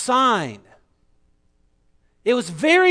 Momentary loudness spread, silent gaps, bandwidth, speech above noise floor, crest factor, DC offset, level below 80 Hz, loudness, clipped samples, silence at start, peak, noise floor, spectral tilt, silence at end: 15 LU; none; 11 kHz; 44 dB; 18 dB; under 0.1%; -62 dBFS; -20 LUFS; under 0.1%; 0 s; -4 dBFS; -62 dBFS; -3.5 dB/octave; 0 s